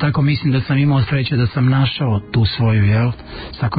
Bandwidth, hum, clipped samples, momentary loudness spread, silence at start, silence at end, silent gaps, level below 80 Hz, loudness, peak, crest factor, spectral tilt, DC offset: 5 kHz; none; under 0.1%; 6 LU; 0 s; 0 s; none; -34 dBFS; -16 LUFS; -6 dBFS; 10 dB; -12.5 dB/octave; under 0.1%